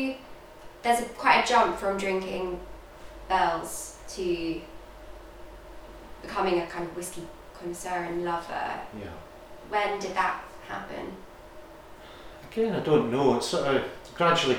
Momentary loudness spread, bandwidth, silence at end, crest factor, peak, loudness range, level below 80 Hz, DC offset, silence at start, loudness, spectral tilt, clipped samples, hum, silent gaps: 24 LU; over 20 kHz; 0 s; 22 dB; -6 dBFS; 7 LU; -52 dBFS; 0.1%; 0 s; -28 LUFS; -4 dB/octave; under 0.1%; none; none